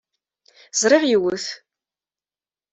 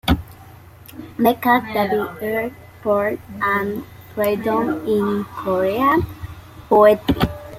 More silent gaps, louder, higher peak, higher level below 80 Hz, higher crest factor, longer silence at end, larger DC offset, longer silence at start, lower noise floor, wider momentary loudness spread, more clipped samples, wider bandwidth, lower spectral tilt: neither; about the same, -19 LUFS vs -19 LUFS; about the same, -2 dBFS vs -2 dBFS; second, -68 dBFS vs -40 dBFS; about the same, 20 dB vs 18 dB; first, 1.15 s vs 0 s; neither; first, 0.75 s vs 0.05 s; first, under -90 dBFS vs -42 dBFS; about the same, 15 LU vs 17 LU; neither; second, 8.2 kHz vs 16.5 kHz; second, -2.5 dB/octave vs -6.5 dB/octave